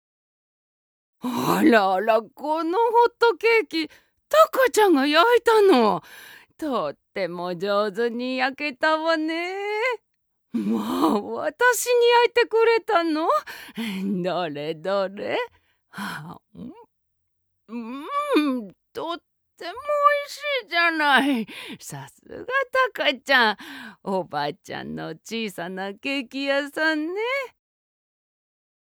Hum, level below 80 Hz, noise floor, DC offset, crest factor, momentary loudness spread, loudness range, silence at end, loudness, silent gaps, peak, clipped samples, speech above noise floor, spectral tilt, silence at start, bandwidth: none; -70 dBFS; -72 dBFS; under 0.1%; 20 dB; 18 LU; 10 LU; 1.45 s; -22 LUFS; none; -2 dBFS; under 0.1%; 49 dB; -4 dB/octave; 1.25 s; over 20 kHz